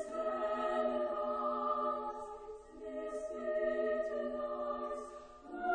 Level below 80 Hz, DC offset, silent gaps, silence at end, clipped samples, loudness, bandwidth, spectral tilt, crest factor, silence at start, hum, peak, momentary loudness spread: -66 dBFS; under 0.1%; none; 0 s; under 0.1%; -38 LUFS; 9.8 kHz; -4.5 dB/octave; 14 dB; 0 s; none; -24 dBFS; 14 LU